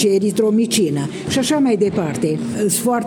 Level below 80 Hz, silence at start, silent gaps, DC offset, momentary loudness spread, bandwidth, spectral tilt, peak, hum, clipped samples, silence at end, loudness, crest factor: -54 dBFS; 0 s; none; under 0.1%; 5 LU; 19.5 kHz; -4.5 dB/octave; -6 dBFS; none; under 0.1%; 0 s; -17 LUFS; 12 dB